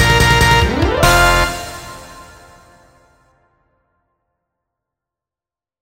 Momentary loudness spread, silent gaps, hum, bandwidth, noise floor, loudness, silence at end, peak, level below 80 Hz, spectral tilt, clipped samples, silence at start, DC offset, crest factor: 21 LU; none; none; 16.5 kHz; under -90 dBFS; -12 LUFS; 3.6 s; 0 dBFS; -26 dBFS; -4 dB/octave; under 0.1%; 0 s; under 0.1%; 18 dB